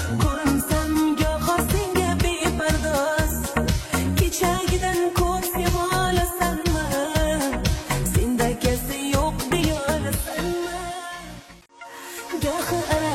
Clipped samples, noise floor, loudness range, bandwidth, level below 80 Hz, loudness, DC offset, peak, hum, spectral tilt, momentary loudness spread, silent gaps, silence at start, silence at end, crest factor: under 0.1%; -44 dBFS; 4 LU; 16.5 kHz; -30 dBFS; -23 LUFS; under 0.1%; -6 dBFS; none; -4.5 dB/octave; 8 LU; none; 0 s; 0 s; 16 dB